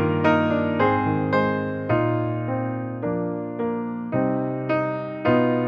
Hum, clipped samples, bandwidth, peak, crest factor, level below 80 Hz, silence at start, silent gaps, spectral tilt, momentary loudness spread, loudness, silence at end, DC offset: none; under 0.1%; 6.4 kHz; -6 dBFS; 16 dB; -56 dBFS; 0 s; none; -9.5 dB/octave; 7 LU; -23 LUFS; 0 s; under 0.1%